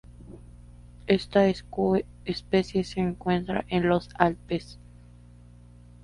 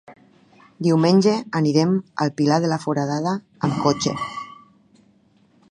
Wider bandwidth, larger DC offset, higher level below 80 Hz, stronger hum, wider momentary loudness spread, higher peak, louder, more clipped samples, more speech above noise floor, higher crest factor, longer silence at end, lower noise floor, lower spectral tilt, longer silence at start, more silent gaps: about the same, 11 kHz vs 10.5 kHz; neither; first, -48 dBFS vs -60 dBFS; first, 60 Hz at -45 dBFS vs none; first, 19 LU vs 10 LU; about the same, -2 dBFS vs -4 dBFS; second, -26 LUFS vs -21 LUFS; neither; second, 24 dB vs 38 dB; first, 26 dB vs 18 dB; about the same, 1.3 s vs 1.2 s; second, -50 dBFS vs -58 dBFS; about the same, -7 dB/octave vs -6 dB/octave; about the same, 0.05 s vs 0.1 s; neither